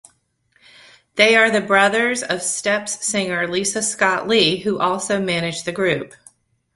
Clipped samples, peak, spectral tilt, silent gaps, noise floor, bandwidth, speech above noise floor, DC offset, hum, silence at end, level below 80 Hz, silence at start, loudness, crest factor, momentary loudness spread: under 0.1%; 0 dBFS; -2.5 dB/octave; none; -63 dBFS; 11.5 kHz; 44 dB; under 0.1%; none; 0.7 s; -60 dBFS; 1.15 s; -18 LUFS; 20 dB; 7 LU